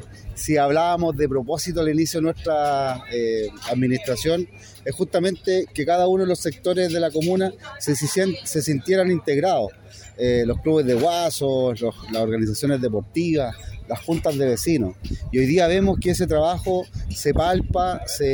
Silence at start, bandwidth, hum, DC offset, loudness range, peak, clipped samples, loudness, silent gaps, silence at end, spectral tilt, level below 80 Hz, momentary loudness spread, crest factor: 0 s; 19 kHz; none; under 0.1%; 2 LU; -6 dBFS; under 0.1%; -22 LUFS; none; 0 s; -5.5 dB/octave; -38 dBFS; 7 LU; 14 dB